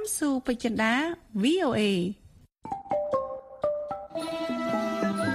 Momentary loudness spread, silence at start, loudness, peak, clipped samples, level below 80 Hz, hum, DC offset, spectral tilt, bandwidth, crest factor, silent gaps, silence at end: 11 LU; 0 s; -28 LUFS; -12 dBFS; under 0.1%; -58 dBFS; none; under 0.1%; -4.5 dB/octave; 15 kHz; 18 dB; none; 0 s